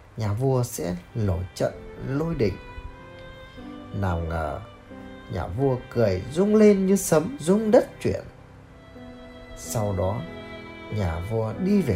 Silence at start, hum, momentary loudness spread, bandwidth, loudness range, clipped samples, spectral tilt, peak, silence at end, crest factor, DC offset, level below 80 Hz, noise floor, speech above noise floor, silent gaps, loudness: 0.15 s; none; 23 LU; 16 kHz; 10 LU; under 0.1%; -6.5 dB/octave; -4 dBFS; 0 s; 20 dB; under 0.1%; -44 dBFS; -47 dBFS; 23 dB; none; -24 LUFS